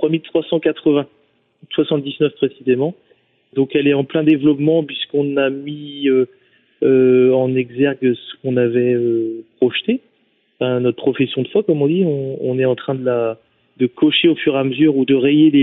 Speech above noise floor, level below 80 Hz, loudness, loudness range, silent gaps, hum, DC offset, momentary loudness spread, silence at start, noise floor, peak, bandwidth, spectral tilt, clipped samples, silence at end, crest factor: 46 dB; -64 dBFS; -17 LUFS; 3 LU; none; none; under 0.1%; 8 LU; 0 s; -61 dBFS; -4 dBFS; 4 kHz; -10.5 dB/octave; under 0.1%; 0 s; 14 dB